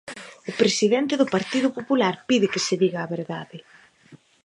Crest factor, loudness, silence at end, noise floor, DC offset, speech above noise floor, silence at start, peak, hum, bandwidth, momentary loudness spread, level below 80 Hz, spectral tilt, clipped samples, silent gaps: 18 dB; -23 LUFS; 0.3 s; -52 dBFS; under 0.1%; 30 dB; 0.05 s; -4 dBFS; none; 11 kHz; 14 LU; -70 dBFS; -4.5 dB/octave; under 0.1%; none